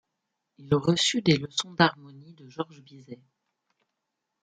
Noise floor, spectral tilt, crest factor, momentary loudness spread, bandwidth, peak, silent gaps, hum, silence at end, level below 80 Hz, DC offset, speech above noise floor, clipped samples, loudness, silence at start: -83 dBFS; -4.5 dB/octave; 24 dB; 24 LU; 9.4 kHz; -6 dBFS; none; none; 1.3 s; -64 dBFS; under 0.1%; 56 dB; under 0.1%; -25 LUFS; 0.6 s